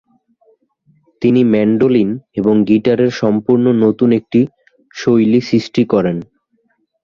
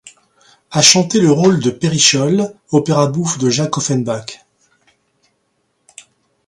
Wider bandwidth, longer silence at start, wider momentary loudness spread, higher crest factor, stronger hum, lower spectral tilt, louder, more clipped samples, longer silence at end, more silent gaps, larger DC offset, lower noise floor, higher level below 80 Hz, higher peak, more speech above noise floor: second, 7 kHz vs 16 kHz; first, 1.2 s vs 0.05 s; second, 7 LU vs 10 LU; about the same, 14 dB vs 16 dB; neither; first, -8 dB/octave vs -4 dB/octave; about the same, -14 LUFS vs -13 LUFS; neither; second, 0.8 s vs 2.15 s; neither; neither; about the same, -62 dBFS vs -65 dBFS; about the same, -52 dBFS vs -56 dBFS; about the same, 0 dBFS vs 0 dBFS; about the same, 50 dB vs 52 dB